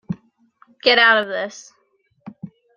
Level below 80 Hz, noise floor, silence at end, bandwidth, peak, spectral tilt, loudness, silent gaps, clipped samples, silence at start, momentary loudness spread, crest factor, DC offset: -66 dBFS; -65 dBFS; 0.3 s; 7.4 kHz; 0 dBFS; -3.5 dB/octave; -16 LUFS; none; under 0.1%; 0.1 s; 24 LU; 20 dB; under 0.1%